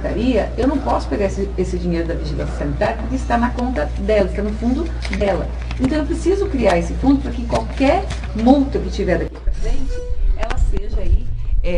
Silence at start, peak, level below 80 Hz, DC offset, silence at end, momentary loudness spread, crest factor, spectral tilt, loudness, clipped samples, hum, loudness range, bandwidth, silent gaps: 0 s; 0 dBFS; -22 dBFS; under 0.1%; 0 s; 8 LU; 18 dB; -7 dB/octave; -20 LUFS; under 0.1%; none; 3 LU; 10.5 kHz; none